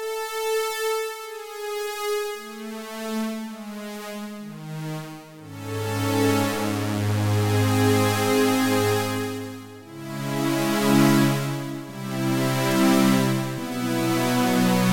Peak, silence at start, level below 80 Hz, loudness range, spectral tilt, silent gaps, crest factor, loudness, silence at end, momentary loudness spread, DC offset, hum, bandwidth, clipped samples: -6 dBFS; 0 s; -60 dBFS; 10 LU; -5.5 dB/octave; none; 18 dB; -23 LUFS; 0 s; 16 LU; under 0.1%; none; 18 kHz; under 0.1%